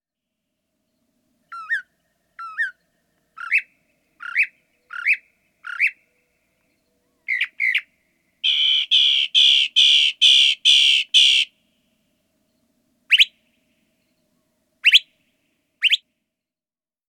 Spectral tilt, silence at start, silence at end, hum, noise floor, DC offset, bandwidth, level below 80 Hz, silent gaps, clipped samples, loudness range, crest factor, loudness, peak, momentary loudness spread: 6 dB/octave; 1.5 s; 1.15 s; none; under -90 dBFS; under 0.1%; 17.5 kHz; -84 dBFS; none; under 0.1%; 13 LU; 20 dB; -16 LUFS; -2 dBFS; 14 LU